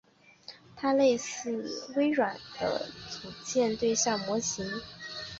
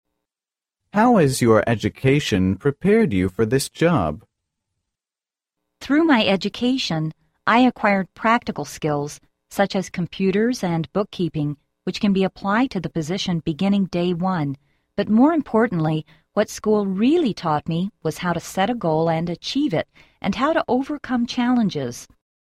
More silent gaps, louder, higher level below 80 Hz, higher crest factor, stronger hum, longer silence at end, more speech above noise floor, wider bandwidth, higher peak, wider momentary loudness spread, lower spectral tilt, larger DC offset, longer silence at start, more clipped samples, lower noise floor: neither; second, -30 LUFS vs -21 LUFS; second, -64 dBFS vs -50 dBFS; about the same, 18 dB vs 16 dB; neither; second, 0 s vs 0.35 s; second, 23 dB vs over 70 dB; second, 8 kHz vs 15 kHz; second, -14 dBFS vs -4 dBFS; first, 15 LU vs 11 LU; second, -3 dB/octave vs -6 dB/octave; neither; second, 0.5 s vs 0.95 s; neither; second, -52 dBFS vs under -90 dBFS